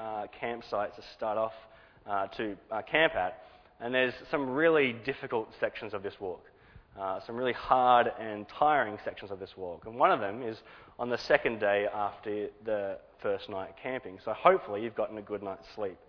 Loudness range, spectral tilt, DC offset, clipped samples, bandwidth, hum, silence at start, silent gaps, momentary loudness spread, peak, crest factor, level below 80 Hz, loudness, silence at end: 3 LU; -6 dB/octave; under 0.1%; under 0.1%; 5.4 kHz; none; 0 s; none; 14 LU; -6 dBFS; 26 dB; -64 dBFS; -31 LUFS; 0.15 s